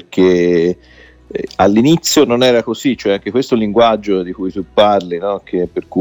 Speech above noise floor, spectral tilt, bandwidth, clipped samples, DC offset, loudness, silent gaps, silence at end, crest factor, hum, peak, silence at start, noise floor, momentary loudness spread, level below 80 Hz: 30 dB; -5 dB/octave; 17.5 kHz; under 0.1%; under 0.1%; -14 LUFS; none; 0 s; 14 dB; none; 0 dBFS; 0.1 s; -43 dBFS; 10 LU; -46 dBFS